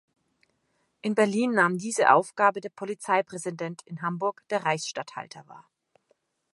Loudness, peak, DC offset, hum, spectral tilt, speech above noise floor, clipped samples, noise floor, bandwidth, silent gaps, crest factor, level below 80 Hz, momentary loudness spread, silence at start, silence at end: -26 LUFS; -4 dBFS; under 0.1%; none; -4.5 dB/octave; 47 dB; under 0.1%; -73 dBFS; 11.5 kHz; none; 24 dB; -82 dBFS; 15 LU; 1.05 s; 0.95 s